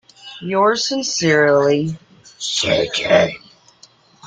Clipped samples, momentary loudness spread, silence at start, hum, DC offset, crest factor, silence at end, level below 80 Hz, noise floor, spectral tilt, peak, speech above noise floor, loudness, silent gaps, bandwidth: under 0.1%; 17 LU; 0.25 s; none; under 0.1%; 16 dB; 0 s; -56 dBFS; -50 dBFS; -3.5 dB/octave; -2 dBFS; 34 dB; -17 LUFS; none; 9.4 kHz